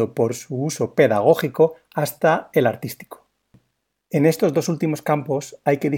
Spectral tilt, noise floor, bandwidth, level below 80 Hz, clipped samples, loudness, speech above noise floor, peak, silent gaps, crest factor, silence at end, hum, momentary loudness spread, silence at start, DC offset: -6 dB/octave; -73 dBFS; 18 kHz; -68 dBFS; under 0.1%; -20 LUFS; 53 dB; -2 dBFS; none; 18 dB; 0 s; none; 9 LU; 0 s; under 0.1%